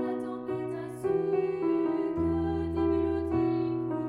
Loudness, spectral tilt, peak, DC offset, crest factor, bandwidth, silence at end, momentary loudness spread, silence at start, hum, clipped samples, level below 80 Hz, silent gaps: -30 LUFS; -9 dB/octave; -18 dBFS; under 0.1%; 12 dB; 11 kHz; 0 s; 6 LU; 0 s; none; under 0.1%; -48 dBFS; none